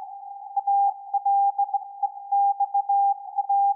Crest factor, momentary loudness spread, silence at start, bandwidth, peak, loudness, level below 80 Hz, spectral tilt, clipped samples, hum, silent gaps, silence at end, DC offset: 8 dB; 9 LU; 0 s; 1 kHz; -16 dBFS; -24 LUFS; under -90 dBFS; -4 dB/octave; under 0.1%; none; none; 0 s; under 0.1%